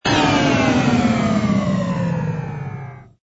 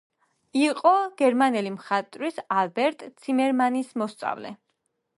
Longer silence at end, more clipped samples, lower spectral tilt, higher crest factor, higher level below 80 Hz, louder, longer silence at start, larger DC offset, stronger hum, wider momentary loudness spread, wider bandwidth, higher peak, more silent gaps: second, 0.2 s vs 0.6 s; neither; about the same, -6 dB/octave vs -5 dB/octave; about the same, 14 dB vs 18 dB; first, -42 dBFS vs -80 dBFS; first, -18 LUFS vs -24 LUFS; second, 0.05 s vs 0.55 s; neither; neither; first, 14 LU vs 11 LU; second, 8 kHz vs 11.5 kHz; about the same, -4 dBFS vs -6 dBFS; neither